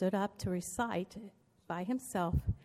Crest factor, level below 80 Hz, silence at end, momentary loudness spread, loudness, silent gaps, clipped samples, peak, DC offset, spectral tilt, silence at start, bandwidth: 16 dB; -48 dBFS; 0 s; 11 LU; -37 LUFS; none; under 0.1%; -20 dBFS; under 0.1%; -6 dB/octave; 0 s; 15 kHz